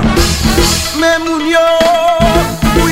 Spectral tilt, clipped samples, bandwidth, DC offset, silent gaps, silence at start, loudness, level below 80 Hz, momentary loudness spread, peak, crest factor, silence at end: -4 dB/octave; under 0.1%; 16.5 kHz; 2%; none; 0 s; -10 LUFS; -20 dBFS; 3 LU; 0 dBFS; 10 dB; 0 s